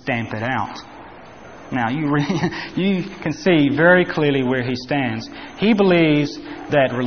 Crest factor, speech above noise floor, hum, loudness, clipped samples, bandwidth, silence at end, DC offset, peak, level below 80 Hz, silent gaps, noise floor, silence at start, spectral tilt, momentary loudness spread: 18 dB; 21 dB; none; -19 LUFS; under 0.1%; 6.6 kHz; 0 s; 0.4%; -2 dBFS; -52 dBFS; none; -40 dBFS; 0.05 s; -5 dB/octave; 15 LU